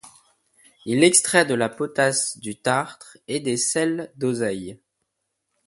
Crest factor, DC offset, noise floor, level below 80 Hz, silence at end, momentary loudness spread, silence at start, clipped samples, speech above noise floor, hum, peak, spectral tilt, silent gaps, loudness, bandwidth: 22 dB; under 0.1%; -78 dBFS; -64 dBFS; 0.95 s; 17 LU; 0.05 s; under 0.1%; 56 dB; none; 0 dBFS; -3 dB/octave; none; -21 LUFS; 12 kHz